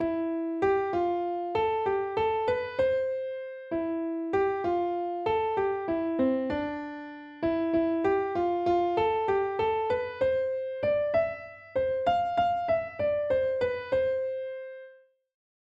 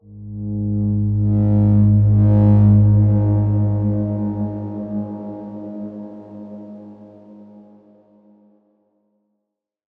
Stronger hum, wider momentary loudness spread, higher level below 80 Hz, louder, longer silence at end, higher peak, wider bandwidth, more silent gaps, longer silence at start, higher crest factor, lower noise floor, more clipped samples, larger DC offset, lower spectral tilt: neither; second, 8 LU vs 23 LU; second, -60 dBFS vs -38 dBFS; second, -28 LUFS vs -17 LUFS; second, 0.8 s vs 2.55 s; second, -14 dBFS vs -4 dBFS; first, 7.4 kHz vs 1.8 kHz; neither; about the same, 0 s vs 0.1 s; about the same, 14 dB vs 14 dB; second, -55 dBFS vs -79 dBFS; neither; neither; second, -7.5 dB/octave vs -14 dB/octave